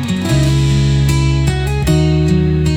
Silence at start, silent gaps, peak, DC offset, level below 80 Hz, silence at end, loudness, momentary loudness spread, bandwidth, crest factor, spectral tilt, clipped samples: 0 s; none; -2 dBFS; under 0.1%; -22 dBFS; 0 s; -13 LUFS; 3 LU; 15 kHz; 12 dB; -6.5 dB/octave; under 0.1%